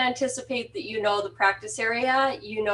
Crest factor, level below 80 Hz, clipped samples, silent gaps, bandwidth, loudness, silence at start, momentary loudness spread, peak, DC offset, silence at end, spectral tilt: 20 dB; -62 dBFS; under 0.1%; none; 11.5 kHz; -26 LUFS; 0 s; 8 LU; -6 dBFS; under 0.1%; 0 s; -2.5 dB/octave